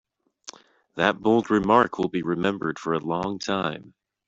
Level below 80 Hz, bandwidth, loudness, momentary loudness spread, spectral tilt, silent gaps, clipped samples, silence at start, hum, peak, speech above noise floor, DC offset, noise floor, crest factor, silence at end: -60 dBFS; 7.8 kHz; -24 LUFS; 22 LU; -5.5 dB/octave; none; under 0.1%; 0.95 s; none; -4 dBFS; 24 dB; under 0.1%; -47 dBFS; 22 dB; 0.4 s